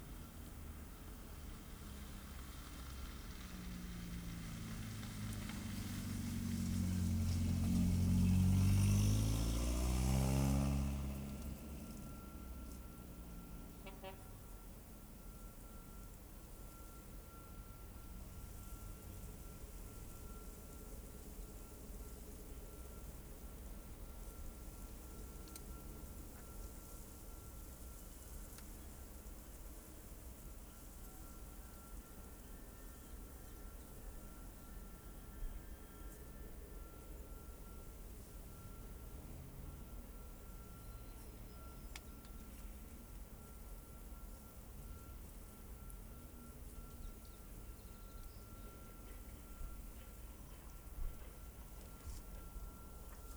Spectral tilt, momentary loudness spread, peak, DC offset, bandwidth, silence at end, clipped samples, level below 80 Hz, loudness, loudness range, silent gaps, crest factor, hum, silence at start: -6 dB/octave; 17 LU; -24 dBFS; under 0.1%; over 20 kHz; 0 s; under 0.1%; -50 dBFS; -46 LUFS; 18 LU; none; 20 dB; none; 0 s